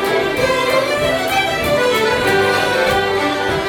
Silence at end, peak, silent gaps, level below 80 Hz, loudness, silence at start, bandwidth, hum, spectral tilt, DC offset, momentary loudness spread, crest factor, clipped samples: 0 s; -4 dBFS; none; -40 dBFS; -15 LUFS; 0 s; over 20 kHz; none; -3.5 dB/octave; under 0.1%; 3 LU; 12 dB; under 0.1%